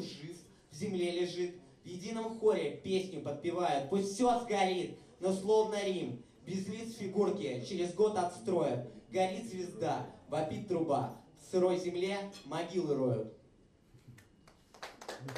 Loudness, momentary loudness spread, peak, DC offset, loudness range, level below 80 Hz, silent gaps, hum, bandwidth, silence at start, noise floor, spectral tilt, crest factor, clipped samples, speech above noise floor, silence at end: -35 LUFS; 14 LU; -18 dBFS; under 0.1%; 3 LU; -70 dBFS; none; none; 13.5 kHz; 0 s; -64 dBFS; -5.5 dB/octave; 16 dB; under 0.1%; 30 dB; 0 s